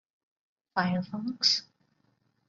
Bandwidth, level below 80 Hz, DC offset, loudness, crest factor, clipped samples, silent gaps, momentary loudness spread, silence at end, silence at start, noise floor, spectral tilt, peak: 7.6 kHz; -72 dBFS; under 0.1%; -28 LUFS; 24 dB; under 0.1%; none; 10 LU; 0.85 s; 0.75 s; -72 dBFS; -3.5 dB/octave; -10 dBFS